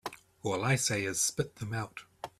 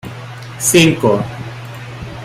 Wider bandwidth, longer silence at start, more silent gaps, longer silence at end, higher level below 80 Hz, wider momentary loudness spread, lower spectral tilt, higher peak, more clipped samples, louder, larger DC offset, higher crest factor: about the same, 15.5 kHz vs 16 kHz; about the same, 0.05 s vs 0.05 s; neither; about the same, 0.1 s vs 0 s; second, -64 dBFS vs -44 dBFS; second, 15 LU vs 20 LU; about the same, -3.5 dB/octave vs -4 dB/octave; second, -16 dBFS vs 0 dBFS; neither; second, -32 LUFS vs -13 LUFS; neither; about the same, 18 dB vs 16 dB